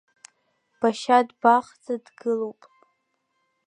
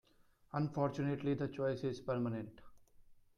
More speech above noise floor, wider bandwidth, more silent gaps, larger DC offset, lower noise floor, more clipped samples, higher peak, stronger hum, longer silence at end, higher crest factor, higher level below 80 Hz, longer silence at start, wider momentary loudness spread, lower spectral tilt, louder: first, 51 dB vs 31 dB; about the same, 10.5 kHz vs 10 kHz; neither; neither; first, -74 dBFS vs -69 dBFS; neither; first, -4 dBFS vs -22 dBFS; neither; first, 1.15 s vs 0.25 s; first, 22 dB vs 16 dB; second, -80 dBFS vs -68 dBFS; first, 0.8 s vs 0.55 s; first, 13 LU vs 7 LU; second, -4.5 dB/octave vs -8.5 dB/octave; first, -23 LUFS vs -39 LUFS